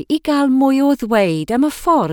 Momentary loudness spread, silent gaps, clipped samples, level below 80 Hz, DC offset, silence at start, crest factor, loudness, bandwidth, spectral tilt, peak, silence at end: 4 LU; none; under 0.1%; -46 dBFS; under 0.1%; 0 s; 12 dB; -15 LUFS; 17.5 kHz; -6 dB/octave; -4 dBFS; 0 s